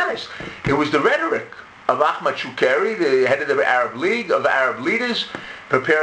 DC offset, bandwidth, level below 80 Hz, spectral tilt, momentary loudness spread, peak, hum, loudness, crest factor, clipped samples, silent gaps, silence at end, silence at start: under 0.1%; 9.8 kHz; -54 dBFS; -5 dB/octave; 9 LU; 0 dBFS; none; -19 LUFS; 20 dB; under 0.1%; none; 0 s; 0 s